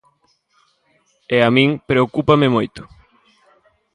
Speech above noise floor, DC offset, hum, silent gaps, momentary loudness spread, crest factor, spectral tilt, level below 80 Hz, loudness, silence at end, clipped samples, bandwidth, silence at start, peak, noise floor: 46 dB; under 0.1%; none; none; 9 LU; 18 dB; -7.5 dB/octave; -52 dBFS; -16 LUFS; 1.1 s; under 0.1%; 10.5 kHz; 1.3 s; 0 dBFS; -62 dBFS